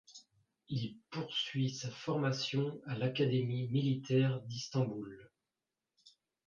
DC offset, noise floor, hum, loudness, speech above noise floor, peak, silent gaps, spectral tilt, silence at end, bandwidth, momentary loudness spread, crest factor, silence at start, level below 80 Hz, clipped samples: under 0.1%; under -90 dBFS; none; -36 LUFS; over 55 dB; -20 dBFS; none; -6 dB/octave; 0.4 s; 7.4 kHz; 10 LU; 16 dB; 0.1 s; -76 dBFS; under 0.1%